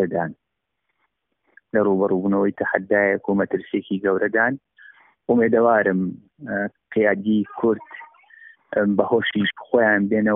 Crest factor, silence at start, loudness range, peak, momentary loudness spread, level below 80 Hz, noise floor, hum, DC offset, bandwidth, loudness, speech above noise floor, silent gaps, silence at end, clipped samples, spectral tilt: 20 dB; 0 s; 2 LU; -2 dBFS; 11 LU; -62 dBFS; -77 dBFS; none; under 0.1%; 3.8 kHz; -21 LUFS; 57 dB; none; 0 s; under 0.1%; -5 dB/octave